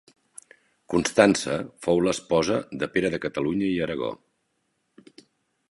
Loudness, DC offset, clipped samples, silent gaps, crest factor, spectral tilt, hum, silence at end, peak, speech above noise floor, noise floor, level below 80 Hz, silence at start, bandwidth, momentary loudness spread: -24 LUFS; under 0.1%; under 0.1%; none; 24 dB; -4.5 dB/octave; none; 1.55 s; -2 dBFS; 50 dB; -74 dBFS; -56 dBFS; 0.9 s; 11.5 kHz; 10 LU